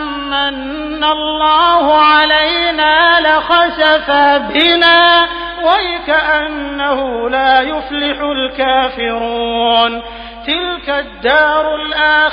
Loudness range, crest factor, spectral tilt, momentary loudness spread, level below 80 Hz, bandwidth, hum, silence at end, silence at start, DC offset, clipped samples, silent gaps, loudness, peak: 5 LU; 12 dB; -5 dB/octave; 9 LU; -38 dBFS; 5.2 kHz; none; 0 s; 0 s; under 0.1%; under 0.1%; none; -12 LUFS; 0 dBFS